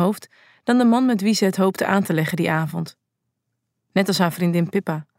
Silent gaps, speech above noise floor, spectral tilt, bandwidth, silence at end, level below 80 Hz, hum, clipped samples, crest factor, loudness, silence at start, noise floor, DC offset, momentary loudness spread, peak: none; 58 dB; -6 dB/octave; 16 kHz; 0.15 s; -70 dBFS; none; under 0.1%; 18 dB; -20 LUFS; 0 s; -77 dBFS; under 0.1%; 11 LU; -4 dBFS